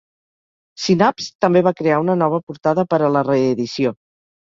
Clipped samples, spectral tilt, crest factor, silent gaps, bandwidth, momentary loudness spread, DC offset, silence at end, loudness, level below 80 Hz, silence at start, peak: under 0.1%; -6.5 dB/octave; 18 dB; 1.35-1.39 s, 2.43-2.47 s; 7.6 kHz; 6 LU; under 0.1%; 0.55 s; -18 LUFS; -60 dBFS; 0.8 s; -2 dBFS